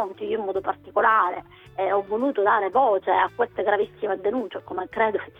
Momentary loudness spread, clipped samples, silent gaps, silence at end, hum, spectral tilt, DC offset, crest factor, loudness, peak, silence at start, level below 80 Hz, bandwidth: 10 LU; under 0.1%; none; 0.1 s; none; -7 dB/octave; under 0.1%; 18 dB; -23 LUFS; -6 dBFS; 0 s; -62 dBFS; 4 kHz